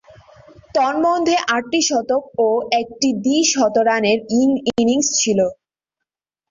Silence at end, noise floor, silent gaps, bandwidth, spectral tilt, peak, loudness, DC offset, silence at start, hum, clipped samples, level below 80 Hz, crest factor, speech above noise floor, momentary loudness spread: 0.95 s; -83 dBFS; none; 7.6 kHz; -3 dB/octave; -4 dBFS; -17 LUFS; under 0.1%; 0.75 s; none; under 0.1%; -58 dBFS; 16 dB; 66 dB; 4 LU